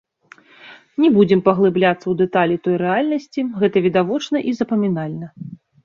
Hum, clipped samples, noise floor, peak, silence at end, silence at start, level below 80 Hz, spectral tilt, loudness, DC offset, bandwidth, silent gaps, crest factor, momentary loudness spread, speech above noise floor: none; under 0.1%; -49 dBFS; -2 dBFS; 0.3 s; 0.65 s; -60 dBFS; -7.5 dB/octave; -18 LUFS; under 0.1%; 7.2 kHz; none; 16 dB; 14 LU; 32 dB